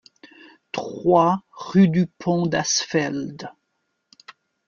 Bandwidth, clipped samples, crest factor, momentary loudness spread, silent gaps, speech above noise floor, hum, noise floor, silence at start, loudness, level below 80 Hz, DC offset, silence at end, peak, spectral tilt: 7.4 kHz; under 0.1%; 20 dB; 15 LU; none; 54 dB; none; -74 dBFS; 0.75 s; -21 LUFS; -60 dBFS; under 0.1%; 1.2 s; -4 dBFS; -5 dB/octave